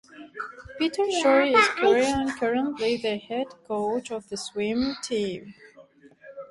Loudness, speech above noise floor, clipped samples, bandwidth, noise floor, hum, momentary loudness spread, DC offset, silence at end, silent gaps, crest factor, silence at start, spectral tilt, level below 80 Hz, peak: -25 LUFS; 28 dB; under 0.1%; 11.5 kHz; -53 dBFS; none; 18 LU; under 0.1%; 0.05 s; none; 20 dB; 0.15 s; -3.5 dB/octave; -56 dBFS; -6 dBFS